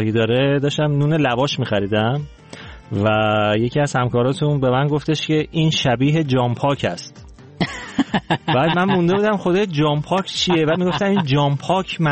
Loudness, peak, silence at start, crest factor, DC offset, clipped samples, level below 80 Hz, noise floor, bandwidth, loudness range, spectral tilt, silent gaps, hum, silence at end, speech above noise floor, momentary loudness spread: -18 LUFS; -6 dBFS; 0 s; 12 dB; under 0.1%; under 0.1%; -48 dBFS; -38 dBFS; 8.8 kHz; 2 LU; -6 dB/octave; none; none; 0 s; 20 dB; 7 LU